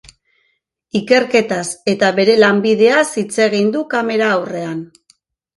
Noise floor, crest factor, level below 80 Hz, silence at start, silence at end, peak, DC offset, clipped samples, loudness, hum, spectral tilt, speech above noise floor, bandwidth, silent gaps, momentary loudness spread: -66 dBFS; 16 dB; -60 dBFS; 0.95 s; 0.7 s; 0 dBFS; under 0.1%; under 0.1%; -15 LUFS; none; -4.5 dB/octave; 52 dB; 11.5 kHz; none; 11 LU